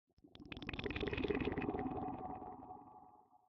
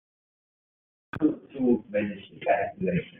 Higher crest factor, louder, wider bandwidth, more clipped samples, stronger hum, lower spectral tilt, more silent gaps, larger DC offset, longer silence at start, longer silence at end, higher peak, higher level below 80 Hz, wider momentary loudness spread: about the same, 22 dB vs 18 dB; second, -43 LUFS vs -28 LUFS; first, 6.6 kHz vs 3.9 kHz; neither; neither; second, -4.5 dB/octave vs -6.5 dB/octave; neither; neither; second, 0.25 s vs 1.15 s; about the same, 0.1 s vs 0.1 s; second, -22 dBFS vs -10 dBFS; about the same, -58 dBFS vs -62 dBFS; first, 21 LU vs 8 LU